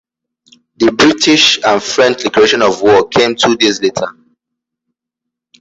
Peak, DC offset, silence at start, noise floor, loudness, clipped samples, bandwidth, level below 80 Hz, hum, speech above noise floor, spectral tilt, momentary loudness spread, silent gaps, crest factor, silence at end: 0 dBFS; under 0.1%; 0.8 s; -79 dBFS; -10 LUFS; under 0.1%; 8 kHz; -48 dBFS; none; 69 dB; -3 dB/octave; 7 LU; none; 12 dB; 1.5 s